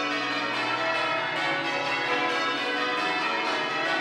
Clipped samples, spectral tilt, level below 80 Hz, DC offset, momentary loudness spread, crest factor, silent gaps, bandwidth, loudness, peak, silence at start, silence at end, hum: under 0.1%; -3 dB/octave; -78 dBFS; under 0.1%; 2 LU; 14 dB; none; 14 kHz; -26 LUFS; -14 dBFS; 0 s; 0 s; none